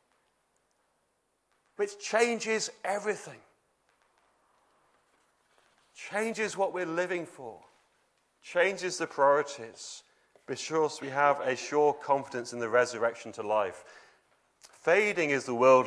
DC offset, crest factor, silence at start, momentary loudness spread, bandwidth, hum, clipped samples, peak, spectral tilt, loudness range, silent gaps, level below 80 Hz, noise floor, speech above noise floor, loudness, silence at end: under 0.1%; 22 dB; 1.8 s; 16 LU; 11 kHz; none; under 0.1%; -10 dBFS; -3.5 dB/octave; 8 LU; none; -84 dBFS; -76 dBFS; 47 dB; -29 LUFS; 0 s